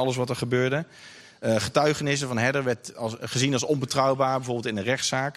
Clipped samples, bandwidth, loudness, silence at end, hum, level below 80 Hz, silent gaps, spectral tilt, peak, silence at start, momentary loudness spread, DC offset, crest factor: under 0.1%; 14 kHz; -25 LUFS; 0.05 s; none; -62 dBFS; none; -4.5 dB/octave; -8 dBFS; 0 s; 9 LU; under 0.1%; 18 dB